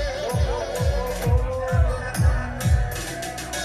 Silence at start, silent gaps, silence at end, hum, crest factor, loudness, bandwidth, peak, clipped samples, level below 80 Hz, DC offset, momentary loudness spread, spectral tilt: 0 s; none; 0 s; none; 14 dB; -24 LUFS; 15 kHz; -8 dBFS; under 0.1%; -26 dBFS; under 0.1%; 6 LU; -5.5 dB/octave